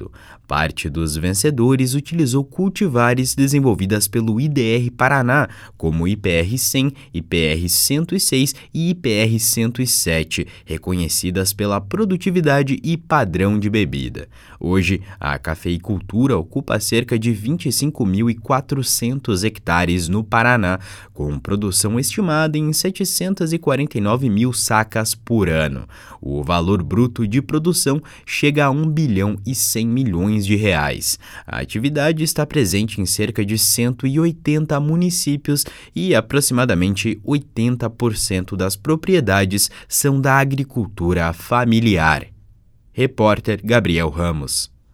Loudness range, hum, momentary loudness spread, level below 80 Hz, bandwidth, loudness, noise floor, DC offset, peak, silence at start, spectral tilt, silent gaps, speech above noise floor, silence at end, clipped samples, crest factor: 2 LU; none; 7 LU; -38 dBFS; 17.5 kHz; -18 LUFS; -49 dBFS; under 0.1%; 0 dBFS; 0 s; -4.5 dB/octave; none; 31 dB; 0.3 s; under 0.1%; 18 dB